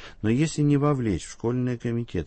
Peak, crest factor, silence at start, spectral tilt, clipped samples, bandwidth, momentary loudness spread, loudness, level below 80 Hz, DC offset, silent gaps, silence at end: -10 dBFS; 14 dB; 0 s; -7 dB/octave; under 0.1%; 8.8 kHz; 7 LU; -25 LUFS; -48 dBFS; under 0.1%; none; 0 s